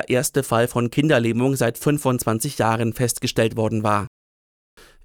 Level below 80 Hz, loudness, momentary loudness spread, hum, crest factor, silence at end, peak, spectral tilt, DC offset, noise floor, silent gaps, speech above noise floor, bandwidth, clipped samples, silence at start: -50 dBFS; -21 LUFS; 4 LU; none; 16 dB; 0.95 s; -6 dBFS; -5 dB/octave; under 0.1%; under -90 dBFS; none; over 70 dB; 18.5 kHz; under 0.1%; 0 s